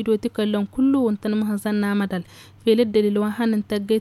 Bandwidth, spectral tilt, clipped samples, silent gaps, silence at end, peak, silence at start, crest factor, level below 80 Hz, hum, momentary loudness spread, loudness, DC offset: 13 kHz; -7 dB/octave; under 0.1%; none; 0 s; -6 dBFS; 0 s; 14 dB; -56 dBFS; none; 6 LU; -22 LUFS; under 0.1%